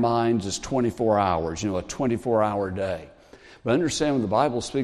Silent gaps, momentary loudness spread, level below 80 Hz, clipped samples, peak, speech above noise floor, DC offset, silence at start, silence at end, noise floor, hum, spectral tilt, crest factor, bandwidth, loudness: none; 6 LU; -52 dBFS; under 0.1%; -6 dBFS; 26 dB; under 0.1%; 0 s; 0 s; -50 dBFS; none; -5.5 dB/octave; 18 dB; 13 kHz; -24 LUFS